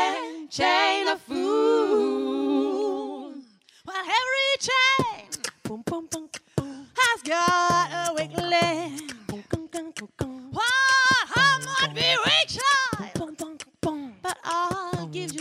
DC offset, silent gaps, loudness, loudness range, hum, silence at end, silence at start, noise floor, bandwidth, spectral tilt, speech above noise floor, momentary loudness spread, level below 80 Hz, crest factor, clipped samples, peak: under 0.1%; none; -23 LUFS; 5 LU; none; 0 s; 0 s; -49 dBFS; 16 kHz; -3 dB/octave; 26 dB; 15 LU; -58 dBFS; 18 dB; under 0.1%; -8 dBFS